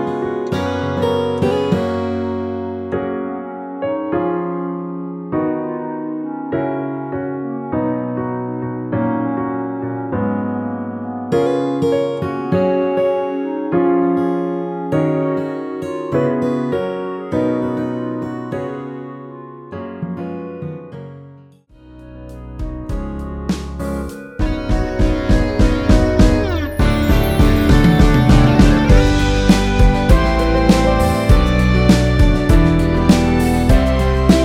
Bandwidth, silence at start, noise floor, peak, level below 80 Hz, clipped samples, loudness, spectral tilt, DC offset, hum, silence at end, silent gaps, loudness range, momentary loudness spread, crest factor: 16.5 kHz; 0 s; -44 dBFS; 0 dBFS; -22 dBFS; under 0.1%; -17 LUFS; -7 dB/octave; under 0.1%; none; 0 s; none; 14 LU; 14 LU; 16 dB